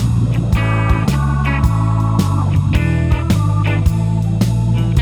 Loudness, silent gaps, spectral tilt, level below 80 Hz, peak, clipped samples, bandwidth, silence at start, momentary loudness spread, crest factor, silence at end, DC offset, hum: -15 LUFS; none; -7 dB/octave; -22 dBFS; -2 dBFS; under 0.1%; 14 kHz; 0 s; 1 LU; 12 dB; 0 s; under 0.1%; none